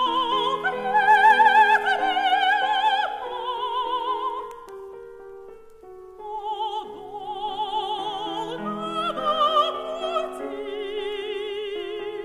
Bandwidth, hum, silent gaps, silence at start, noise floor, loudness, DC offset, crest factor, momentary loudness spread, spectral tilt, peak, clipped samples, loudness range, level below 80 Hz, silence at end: 14.5 kHz; none; none; 0 s; -44 dBFS; -23 LUFS; under 0.1%; 18 dB; 20 LU; -3 dB/octave; -6 dBFS; under 0.1%; 13 LU; -62 dBFS; 0 s